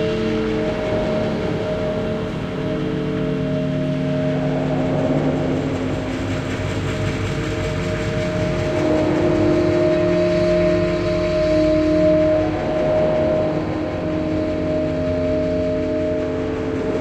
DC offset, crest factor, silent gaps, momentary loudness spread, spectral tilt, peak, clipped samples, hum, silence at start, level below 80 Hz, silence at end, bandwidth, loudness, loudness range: under 0.1%; 14 dB; none; 6 LU; -7.5 dB/octave; -6 dBFS; under 0.1%; none; 0 s; -36 dBFS; 0 s; 9.4 kHz; -20 LUFS; 5 LU